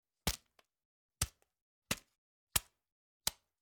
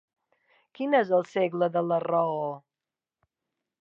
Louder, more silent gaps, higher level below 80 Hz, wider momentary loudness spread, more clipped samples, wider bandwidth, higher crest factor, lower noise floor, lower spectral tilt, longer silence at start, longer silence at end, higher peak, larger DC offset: second, -40 LUFS vs -27 LUFS; first, 0.85-1.09 s, 1.61-1.82 s, 2.18-2.47 s, 2.92-3.20 s vs none; first, -56 dBFS vs -84 dBFS; second, 5 LU vs 11 LU; neither; first, over 20 kHz vs 7.4 kHz; first, 34 dB vs 18 dB; second, -67 dBFS vs under -90 dBFS; second, -1.5 dB/octave vs -7.5 dB/octave; second, 0.25 s vs 0.8 s; second, 0.3 s vs 1.2 s; about the same, -12 dBFS vs -12 dBFS; neither